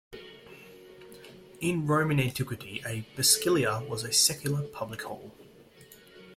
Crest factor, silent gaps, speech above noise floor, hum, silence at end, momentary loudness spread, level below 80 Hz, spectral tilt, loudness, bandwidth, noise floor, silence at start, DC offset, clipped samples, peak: 24 dB; none; 26 dB; none; 0.05 s; 25 LU; -62 dBFS; -3.5 dB/octave; -27 LUFS; 16.5 kHz; -54 dBFS; 0.1 s; under 0.1%; under 0.1%; -8 dBFS